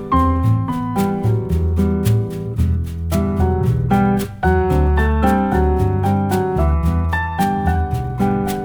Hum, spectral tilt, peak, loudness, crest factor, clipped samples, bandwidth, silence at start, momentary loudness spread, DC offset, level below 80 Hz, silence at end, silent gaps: none; -8 dB/octave; -2 dBFS; -18 LUFS; 14 dB; under 0.1%; over 20 kHz; 0 s; 4 LU; under 0.1%; -24 dBFS; 0 s; none